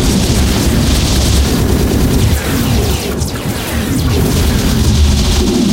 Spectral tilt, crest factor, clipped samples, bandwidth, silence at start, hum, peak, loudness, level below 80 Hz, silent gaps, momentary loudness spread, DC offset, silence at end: -5 dB/octave; 10 dB; under 0.1%; 16 kHz; 0 s; none; 0 dBFS; -13 LUFS; -16 dBFS; none; 5 LU; under 0.1%; 0 s